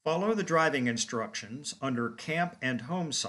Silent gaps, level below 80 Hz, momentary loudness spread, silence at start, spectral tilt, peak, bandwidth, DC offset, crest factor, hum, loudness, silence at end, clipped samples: none; -76 dBFS; 9 LU; 0.05 s; -4 dB/octave; -14 dBFS; 12 kHz; under 0.1%; 18 dB; none; -31 LUFS; 0 s; under 0.1%